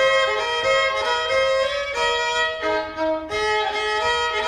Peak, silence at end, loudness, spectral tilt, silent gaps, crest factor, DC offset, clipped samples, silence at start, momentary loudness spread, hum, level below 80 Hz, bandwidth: -6 dBFS; 0 s; -21 LUFS; -1.5 dB/octave; none; 14 dB; under 0.1%; under 0.1%; 0 s; 5 LU; none; -48 dBFS; 12 kHz